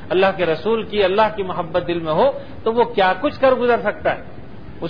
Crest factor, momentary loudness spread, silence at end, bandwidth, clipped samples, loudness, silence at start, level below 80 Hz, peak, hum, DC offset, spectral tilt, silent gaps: 16 dB; 8 LU; 0 s; 5.2 kHz; under 0.1%; -19 LUFS; 0 s; -46 dBFS; -2 dBFS; none; 2%; -8 dB/octave; none